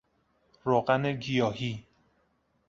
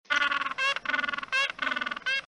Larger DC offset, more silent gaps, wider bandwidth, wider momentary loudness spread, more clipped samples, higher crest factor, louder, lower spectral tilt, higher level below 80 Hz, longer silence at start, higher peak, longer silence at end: neither; neither; second, 7.6 kHz vs 11.5 kHz; first, 11 LU vs 4 LU; neither; about the same, 20 dB vs 20 dB; about the same, -29 LUFS vs -28 LUFS; first, -6.5 dB/octave vs -0.5 dB/octave; about the same, -64 dBFS vs -68 dBFS; first, 0.65 s vs 0.1 s; about the same, -12 dBFS vs -10 dBFS; first, 0.85 s vs 0 s